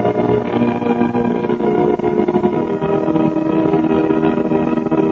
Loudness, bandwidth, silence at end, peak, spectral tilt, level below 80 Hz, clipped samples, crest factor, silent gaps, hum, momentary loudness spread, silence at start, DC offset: -16 LUFS; 6.8 kHz; 0 s; -2 dBFS; -9 dB/octave; -44 dBFS; under 0.1%; 14 dB; none; none; 2 LU; 0 s; under 0.1%